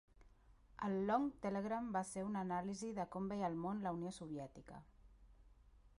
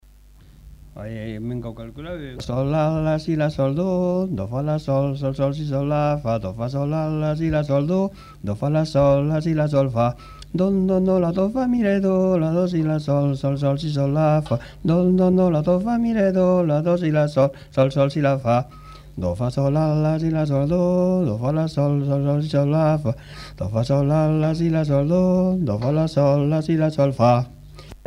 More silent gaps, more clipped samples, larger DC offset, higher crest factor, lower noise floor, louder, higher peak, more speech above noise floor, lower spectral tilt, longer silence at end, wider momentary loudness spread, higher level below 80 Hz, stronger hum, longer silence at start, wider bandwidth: neither; neither; neither; about the same, 20 dB vs 16 dB; first, -67 dBFS vs -48 dBFS; second, -43 LUFS vs -21 LUFS; second, -24 dBFS vs -4 dBFS; about the same, 25 dB vs 28 dB; second, -6.5 dB/octave vs -9 dB/octave; about the same, 0.1 s vs 0.1 s; first, 14 LU vs 10 LU; second, -68 dBFS vs -44 dBFS; neither; second, 0.15 s vs 0.65 s; about the same, 11.5 kHz vs 10.5 kHz